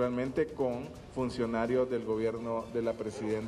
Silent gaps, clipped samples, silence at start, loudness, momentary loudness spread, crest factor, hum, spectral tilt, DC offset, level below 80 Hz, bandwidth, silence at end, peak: none; under 0.1%; 0 s; -33 LUFS; 6 LU; 14 dB; none; -7 dB/octave; under 0.1%; -56 dBFS; 12 kHz; 0 s; -18 dBFS